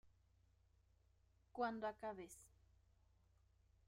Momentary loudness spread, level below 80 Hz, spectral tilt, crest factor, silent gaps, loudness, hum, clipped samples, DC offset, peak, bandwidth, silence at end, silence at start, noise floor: 15 LU; -78 dBFS; -4.5 dB/octave; 24 dB; none; -48 LUFS; none; under 0.1%; under 0.1%; -30 dBFS; 15 kHz; 1.4 s; 0.05 s; -77 dBFS